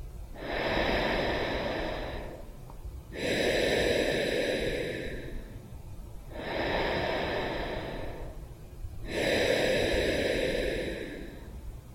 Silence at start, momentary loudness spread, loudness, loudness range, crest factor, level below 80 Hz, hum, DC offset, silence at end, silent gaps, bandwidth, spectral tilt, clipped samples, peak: 0 s; 19 LU; -30 LUFS; 4 LU; 18 dB; -42 dBFS; none; under 0.1%; 0 s; none; 16.5 kHz; -4.5 dB/octave; under 0.1%; -14 dBFS